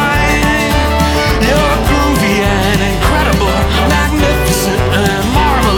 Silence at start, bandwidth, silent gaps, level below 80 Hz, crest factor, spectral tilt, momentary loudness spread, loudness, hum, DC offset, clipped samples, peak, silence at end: 0 s; 20 kHz; none; -18 dBFS; 10 dB; -5 dB/octave; 1 LU; -11 LUFS; none; under 0.1%; under 0.1%; 0 dBFS; 0 s